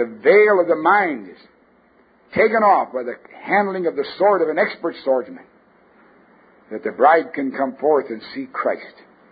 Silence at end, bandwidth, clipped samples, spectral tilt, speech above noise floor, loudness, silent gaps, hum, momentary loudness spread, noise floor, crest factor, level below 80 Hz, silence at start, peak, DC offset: 0.4 s; 5 kHz; under 0.1%; -10 dB/octave; 37 dB; -18 LUFS; none; none; 16 LU; -55 dBFS; 18 dB; -66 dBFS; 0 s; 0 dBFS; under 0.1%